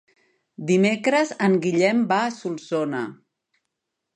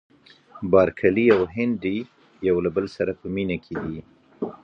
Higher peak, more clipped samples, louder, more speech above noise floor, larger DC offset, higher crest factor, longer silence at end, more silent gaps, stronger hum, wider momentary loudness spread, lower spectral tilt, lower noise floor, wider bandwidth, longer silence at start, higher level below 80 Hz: about the same, -6 dBFS vs -4 dBFS; neither; about the same, -22 LUFS vs -23 LUFS; first, 59 dB vs 27 dB; neither; about the same, 18 dB vs 20 dB; first, 1 s vs 0.1 s; neither; neither; second, 11 LU vs 15 LU; second, -5.5 dB/octave vs -8.5 dB/octave; first, -81 dBFS vs -49 dBFS; first, 10.5 kHz vs 6.8 kHz; about the same, 0.6 s vs 0.55 s; second, -74 dBFS vs -50 dBFS